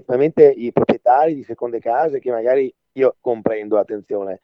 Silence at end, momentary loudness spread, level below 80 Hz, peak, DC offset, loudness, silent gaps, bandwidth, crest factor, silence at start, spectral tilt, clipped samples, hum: 0.05 s; 12 LU; -60 dBFS; 0 dBFS; under 0.1%; -18 LUFS; none; 5.6 kHz; 18 dB; 0.1 s; -9 dB/octave; under 0.1%; none